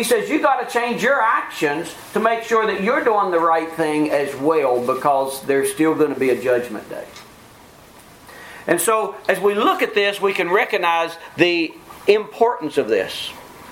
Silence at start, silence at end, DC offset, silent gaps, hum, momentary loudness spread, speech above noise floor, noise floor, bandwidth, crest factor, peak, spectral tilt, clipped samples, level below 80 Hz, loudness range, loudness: 0 s; 0 s; under 0.1%; none; none; 10 LU; 26 dB; -45 dBFS; 16.5 kHz; 20 dB; 0 dBFS; -3.5 dB/octave; under 0.1%; -60 dBFS; 4 LU; -19 LUFS